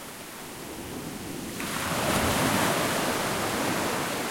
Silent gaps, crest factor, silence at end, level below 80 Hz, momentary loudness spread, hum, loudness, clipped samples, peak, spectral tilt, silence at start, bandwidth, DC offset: none; 16 dB; 0 s; -52 dBFS; 14 LU; none; -27 LUFS; under 0.1%; -12 dBFS; -3.5 dB/octave; 0 s; 16.5 kHz; under 0.1%